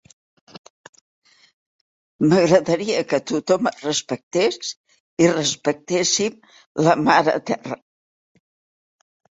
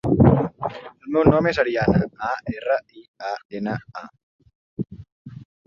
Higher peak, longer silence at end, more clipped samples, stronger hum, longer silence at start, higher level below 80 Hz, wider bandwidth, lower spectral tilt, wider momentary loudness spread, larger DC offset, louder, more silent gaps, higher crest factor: about the same, -2 dBFS vs -2 dBFS; first, 1.6 s vs 0.25 s; neither; neither; first, 2.2 s vs 0.05 s; second, -62 dBFS vs -42 dBFS; first, 8 kHz vs 7.2 kHz; second, -4 dB/octave vs -8.5 dB/octave; second, 14 LU vs 22 LU; neither; about the same, -20 LUFS vs -22 LUFS; second, 4.23-4.31 s, 4.77-4.84 s, 5.00-5.17 s, 6.66-6.75 s vs 3.08-3.14 s, 3.45-3.49 s, 4.23-4.39 s, 4.55-4.77 s, 5.12-5.25 s; about the same, 20 dB vs 20 dB